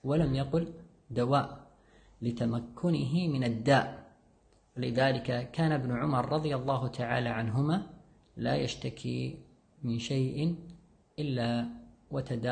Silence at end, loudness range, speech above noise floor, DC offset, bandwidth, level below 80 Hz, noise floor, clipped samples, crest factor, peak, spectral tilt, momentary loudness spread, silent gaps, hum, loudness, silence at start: 0 s; 4 LU; 34 dB; under 0.1%; 9.6 kHz; -56 dBFS; -65 dBFS; under 0.1%; 18 dB; -12 dBFS; -7 dB/octave; 12 LU; none; none; -32 LUFS; 0.05 s